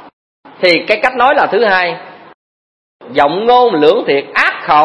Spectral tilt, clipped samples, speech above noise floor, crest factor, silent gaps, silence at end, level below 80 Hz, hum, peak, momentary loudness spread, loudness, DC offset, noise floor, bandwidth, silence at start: -5 dB/octave; 0.2%; over 79 dB; 12 dB; 0.13-0.43 s, 2.34-3.00 s; 0 s; -52 dBFS; none; 0 dBFS; 5 LU; -11 LUFS; 0.2%; under -90 dBFS; 11 kHz; 0.05 s